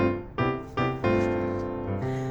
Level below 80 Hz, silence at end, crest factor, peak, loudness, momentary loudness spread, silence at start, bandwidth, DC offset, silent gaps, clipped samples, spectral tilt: -46 dBFS; 0 s; 16 dB; -12 dBFS; -28 LUFS; 6 LU; 0 s; 8 kHz; under 0.1%; none; under 0.1%; -8 dB/octave